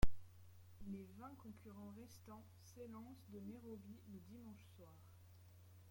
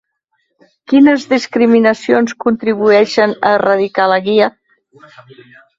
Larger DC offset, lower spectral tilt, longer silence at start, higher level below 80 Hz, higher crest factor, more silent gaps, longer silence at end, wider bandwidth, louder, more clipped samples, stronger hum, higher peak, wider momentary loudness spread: neither; about the same, -6.5 dB/octave vs -5.5 dB/octave; second, 0 s vs 0.9 s; about the same, -54 dBFS vs -58 dBFS; first, 24 dB vs 14 dB; neither; second, 0 s vs 1.3 s; first, 16.5 kHz vs 7.8 kHz; second, -57 LUFS vs -12 LUFS; neither; neither; second, -20 dBFS vs 0 dBFS; first, 11 LU vs 5 LU